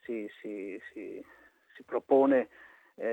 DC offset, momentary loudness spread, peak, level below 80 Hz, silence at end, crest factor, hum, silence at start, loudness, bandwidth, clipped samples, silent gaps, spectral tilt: under 0.1%; 19 LU; -14 dBFS; -80 dBFS; 0 s; 18 dB; none; 0.1 s; -30 LUFS; 8 kHz; under 0.1%; none; -7.5 dB/octave